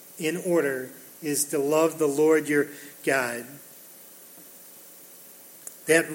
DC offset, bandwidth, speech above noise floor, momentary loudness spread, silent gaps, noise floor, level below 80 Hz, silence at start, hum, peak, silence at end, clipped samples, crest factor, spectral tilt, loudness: under 0.1%; 17 kHz; 23 dB; 22 LU; none; -48 dBFS; -78 dBFS; 0 s; none; -8 dBFS; 0 s; under 0.1%; 20 dB; -4 dB/octave; -25 LUFS